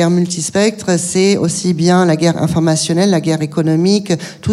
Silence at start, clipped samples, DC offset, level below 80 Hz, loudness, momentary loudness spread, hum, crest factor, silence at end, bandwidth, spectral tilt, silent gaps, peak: 0 s; under 0.1%; under 0.1%; -48 dBFS; -14 LUFS; 4 LU; none; 12 dB; 0 s; 13 kHz; -5 dB/octave; none; -2 dBFS